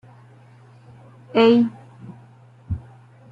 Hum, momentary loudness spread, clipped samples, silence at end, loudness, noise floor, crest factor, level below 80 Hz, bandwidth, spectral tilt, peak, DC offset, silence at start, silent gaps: none; 27 LU; under 0.1%; 0.5 s; -20 LUFS; -48 dBFS; 20 dB; -50 dBFS; 5.6 kHz; -8 dB/octave; -4 dBFS; under 0.1%; 1.35 s; none